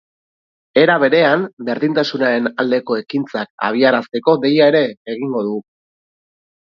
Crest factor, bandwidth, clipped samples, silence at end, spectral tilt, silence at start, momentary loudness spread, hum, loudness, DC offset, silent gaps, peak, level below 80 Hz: 16 dB; 6.8 kHz; under 0.1%; 1.05 s; -6.5 dB/octave; 0.75 s; 10 LU; none; -16 LUFS; under 0.1%; 1.53-1.57 s, 3.50-3.58 s, 4.97-5.05 s; 0 dBFS; -66 dBFS